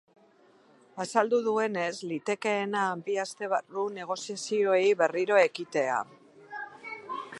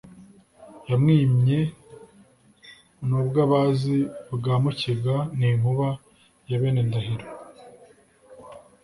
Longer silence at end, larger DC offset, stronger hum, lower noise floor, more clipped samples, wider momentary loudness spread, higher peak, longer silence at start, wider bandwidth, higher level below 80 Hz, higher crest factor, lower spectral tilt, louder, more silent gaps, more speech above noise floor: second, 0 s vs 0.25 s; neither; neither; first, -61 dBFS vs -56 dBFS; neither; about the same, 16 LU vs 14 LU; about the same, -8 dBFS vs -8 dBFS; first, 0.95 s vs 0.1 s; about the same, 11.5 kHz vs 11.5 kHz; second, -84 dBFS vs -54 dBFS; about the same, 20 dB vs 16 dB; second, -4 dB/octave vs -8.5 dB/octave; second, -28 LUFS vs -23 LUFS; neither; about the same, 33 dB vs 34 dB